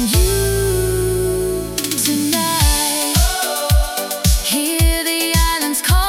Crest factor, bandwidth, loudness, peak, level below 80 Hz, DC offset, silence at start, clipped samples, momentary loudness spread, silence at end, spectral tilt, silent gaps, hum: 14 dB; 18 kHz; -16 LUFS; -2 dBFS; -22 dBFS; under 0.1%; 0 s; under 0.1%; 4 LU; 0 s; -3.5 dB/octave; none; none